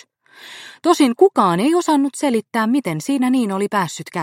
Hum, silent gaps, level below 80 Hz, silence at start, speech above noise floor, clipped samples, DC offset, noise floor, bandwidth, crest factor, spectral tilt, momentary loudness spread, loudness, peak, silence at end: none; none; -70 dBFS; 0.45 s; 27 dB; under 0.1%; under 0.1%; -44 dBFS; 16 kHz; 16 dB; -5 dB/octave; 9 LU; -17 LUFS; -2 dBFS; 0 s